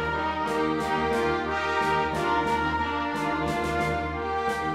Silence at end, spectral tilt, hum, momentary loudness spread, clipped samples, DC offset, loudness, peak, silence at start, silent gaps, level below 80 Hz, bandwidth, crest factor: 0 s; -5.5 dB/octave; none; 3 LU; under 0.1%; under 0.1%; -26 LUFS; -12 dBFS; 0 s; none; -44 dBFS; 16 kHz; 14 dB